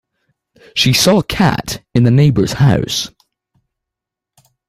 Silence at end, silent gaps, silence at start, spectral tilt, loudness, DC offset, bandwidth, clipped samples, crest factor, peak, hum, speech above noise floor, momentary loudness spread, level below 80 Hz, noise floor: 1.6 s; none; 0.75 s; -5 dB/octave; -13 LUFS; under 0.1%; 16 kHz; under 0.1%; 14 dB; 0 dBFS; none; 70 dB; 10 LU; -40 dBFS; -83 dBFS